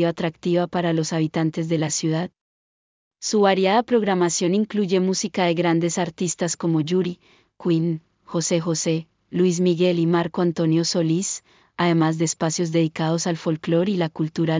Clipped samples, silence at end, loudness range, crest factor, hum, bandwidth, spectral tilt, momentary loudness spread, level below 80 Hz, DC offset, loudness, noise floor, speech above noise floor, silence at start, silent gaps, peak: under 0.1%; 0 s; 3 LU; 16 dB; none; 7.8 kHz; -5 dB/octave; 7 LU; -64 dBFS; under 0.1%; -22 LUFS; under -90 dBFS; over 69 dB; 0 s; 2.41-3.11 s; -6 dBFS